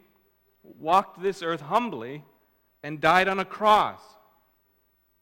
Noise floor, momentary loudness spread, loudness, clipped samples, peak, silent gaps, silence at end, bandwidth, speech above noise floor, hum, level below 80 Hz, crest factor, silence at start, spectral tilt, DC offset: -69 dBFS; 18 LU; -24 LUFS; under 0.1%; -4 dBFS; none; 1.25 s; over 20 kHz; 44 dB; none; -62 dBFS; 24 dB; 0.7 s; -4.5 dB/octave; under 0.1%